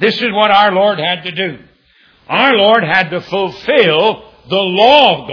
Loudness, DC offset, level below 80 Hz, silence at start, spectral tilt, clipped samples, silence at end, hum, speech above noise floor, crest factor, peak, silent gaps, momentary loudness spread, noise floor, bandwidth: -11 LUFS; under 0.1%; -54 dBFS; 0 s; -6 dB/octave; 0.3%; 0 s; none; 39 dB; 12 dB; 0 dBFS; none; 10 LU; -50 dBFS; 5.4 kHz